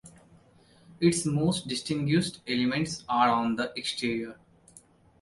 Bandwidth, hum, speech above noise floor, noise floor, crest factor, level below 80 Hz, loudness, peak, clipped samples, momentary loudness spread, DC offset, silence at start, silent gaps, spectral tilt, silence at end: 11.5 kHz; none; 31 dB; -59 dBFS; 18 dB; -62 dBFS; -28 LUFS; -10 dBFS; under 0.1%; 7 LU; under 0.1%; 0.05 s; none; -5 dB/octave; 0.45 s